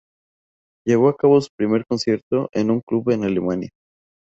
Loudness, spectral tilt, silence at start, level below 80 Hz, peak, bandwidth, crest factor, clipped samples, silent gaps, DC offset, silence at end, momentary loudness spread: -20 LUFS; -7 dB/octave; 0.85 s; -58 dBFS; -4 dBFS; 8 kHz; 16 dB; under 0.1%; 1.49-1.58 s, 2.23-2.31 s, 2.83-2.87 s; under 0.1%; 0.55 s; 9 LU